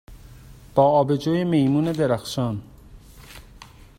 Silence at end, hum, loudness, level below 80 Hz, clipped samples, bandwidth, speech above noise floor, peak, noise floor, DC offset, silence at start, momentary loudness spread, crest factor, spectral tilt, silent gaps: 0.35 s; none; -21 LUFS; -48 dBFS; under 0.1%; 16 kHz; 26 dB; -2 dBFS; -46 dBFS; under 0.1%; 0.1 s; 10 LU; 20 dB; -7 dB/octave; none